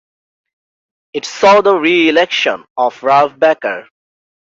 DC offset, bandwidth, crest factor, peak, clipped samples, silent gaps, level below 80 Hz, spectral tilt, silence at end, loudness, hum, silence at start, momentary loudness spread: under 0.1%; 7.8 kHz; 14 dB; 0 dBFS; under 0.1%; 2.70-2.76 s; -62 dBFS; -3.5 dB/octave; 0.7 s; -12 LUFS; none; 1.15 s; 14 LU